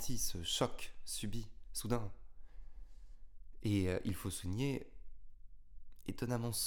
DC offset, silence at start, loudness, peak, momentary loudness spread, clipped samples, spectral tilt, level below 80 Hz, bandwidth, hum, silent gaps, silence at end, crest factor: under 0.1%; 0 s; -40 LUFS; -18 dBFS; 18 LU; under 0.1%; -4.5 dB/octave; -52 dBFS; 19.5 kHz; none; none; 0 s; 22 dB